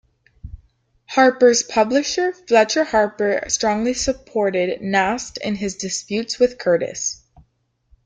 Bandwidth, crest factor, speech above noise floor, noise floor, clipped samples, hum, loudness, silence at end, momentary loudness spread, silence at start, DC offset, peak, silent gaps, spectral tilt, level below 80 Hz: 9.6 kHz; 18 dB; 46 dB; -64 dBFS; under 0.1%; none; -19 LUFS; 0.9 s; 9 LU; 0.45 s; under 0.1%; -2 dBFS; none; -3 dB/octave; -48 dBFS